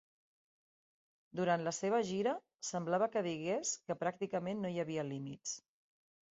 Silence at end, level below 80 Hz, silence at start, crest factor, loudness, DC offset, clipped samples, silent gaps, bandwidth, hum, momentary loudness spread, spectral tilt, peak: 0.75 s; -80 dBFS; 1.35 s; 20 dB; -38 LUFS; under 0.1%; under 0.1%; none; 8 kHz; none; 9 LU; -5 dB/octave; -20 dBFS